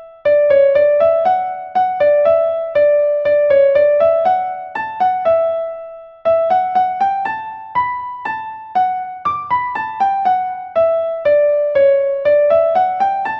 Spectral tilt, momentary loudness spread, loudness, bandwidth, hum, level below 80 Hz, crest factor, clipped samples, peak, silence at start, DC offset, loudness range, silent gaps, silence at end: -6 dB/octave; 11 LU; -15 LUFS; 5.6 kHz; none; -56 dBFS; 12 dB; under 0.1%; -2 dBFS; 0 s; under 0.1%; 5 LU; none; 0 s